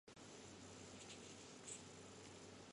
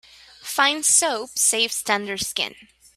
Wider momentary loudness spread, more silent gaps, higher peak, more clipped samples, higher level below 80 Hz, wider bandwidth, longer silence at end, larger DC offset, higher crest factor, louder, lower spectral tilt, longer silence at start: second, 5 LU vs 11 LU; neither; second, -40 dBFS vs -4 dBFS; neither; second, -78 dBFS vs -62 dBFS; second, 11.5 kHz vs 16 kHz; second, 0 s vs 0.45 s; neither; about the same, 18 dB vs 20 dB; second, -57 LUFS vs -20 LUFS; first, -3 dB/octave vs 0.5 dB/octave; second, 0.05 s vs 0.4 s